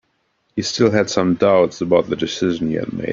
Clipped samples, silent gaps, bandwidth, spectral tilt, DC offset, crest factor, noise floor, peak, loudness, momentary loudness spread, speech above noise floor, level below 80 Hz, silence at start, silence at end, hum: under 0.1%; none; 7.6 kHz; -5.5 dB/octave; under 0.1%; 16 dB; -66 dBFS; -2 dBFS; -18 LUFS; 8 LU; 49 dB; -52 dBFS; 0.55 s; 0 s; none